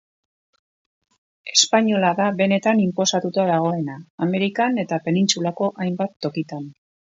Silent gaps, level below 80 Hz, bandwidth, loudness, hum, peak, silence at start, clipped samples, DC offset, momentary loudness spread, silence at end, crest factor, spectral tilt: 4.10-4.18 s, 6.16-6.20 s; -68 dBFS; 8 kHz; -20 LUFS; none; -2 dBFS; 1.45 s; under 0.1%; under 0.1%; 11 LU; 0.4 s; 20 dB; -4 dB/octave